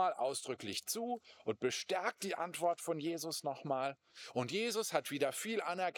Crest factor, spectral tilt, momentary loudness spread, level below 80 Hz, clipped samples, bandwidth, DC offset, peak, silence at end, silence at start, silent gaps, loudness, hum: 20 dB; -3 dB/octave; 6 LU; -90 dBFS; under 0.1%; over 20 kHz; under 0.1%; -18 dBFS; 0 s; 0 s; none; -38 LUFS; none